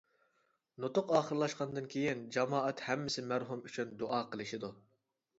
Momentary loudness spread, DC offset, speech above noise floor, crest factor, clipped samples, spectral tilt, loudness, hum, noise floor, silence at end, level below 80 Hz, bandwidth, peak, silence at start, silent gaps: 10 LU; under 0.1%; 42 dB; 22 dB; under 0.1%; -4 dB/octave; -37 LUFS; none; -78 dBFS; 0.6 s; -78 dBFS; 7.6 kHz; -16 dBFS; 0.8 s; none